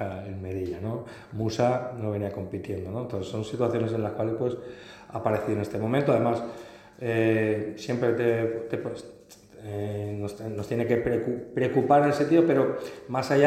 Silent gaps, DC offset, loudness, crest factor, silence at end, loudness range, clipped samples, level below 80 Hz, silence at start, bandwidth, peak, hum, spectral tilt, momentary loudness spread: none; under 0.1%; -27 LUFS; 20 dB; 0 s; 6 LU; under 0.1%; -60 dBFS; 0 s; 14 kHz; -6 dBFS; none; -7.5 dB/octave; 15 LU